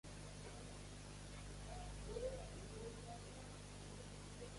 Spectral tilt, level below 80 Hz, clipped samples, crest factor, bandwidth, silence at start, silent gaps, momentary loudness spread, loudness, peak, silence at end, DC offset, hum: -4.5 dB/octave; -58 dBFS; under 0.1%; 18 dB; 11.5 kHz; 0.05 s; none; 7 LU; -53 LUFS; -34 dBFS; 0 s; under 0.1%; 50 Hz at -55 dBFS